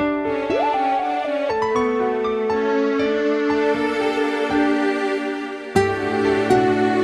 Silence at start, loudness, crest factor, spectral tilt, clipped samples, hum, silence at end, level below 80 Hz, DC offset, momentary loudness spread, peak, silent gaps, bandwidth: 0 s; -20 LUFS; 16 dB; -5.5 dB/octave; under 0.1%; none; 0 s; -50 dBFS; under 0.1%; 5 LU; -4 dBFS; none; 13 kHz